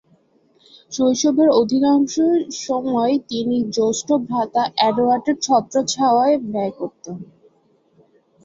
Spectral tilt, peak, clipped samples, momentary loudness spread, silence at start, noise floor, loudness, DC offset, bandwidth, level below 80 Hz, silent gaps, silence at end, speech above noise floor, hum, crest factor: -4.5 dB/octave; -4 dBFS; under 0.1%; 10 LU; 0.9 s; -59 dBFS; -18 LUFS; under 0.1%; 7.8 kHz; -62 dBFS; none; 1.2 s; 41 dB; none; 16 dB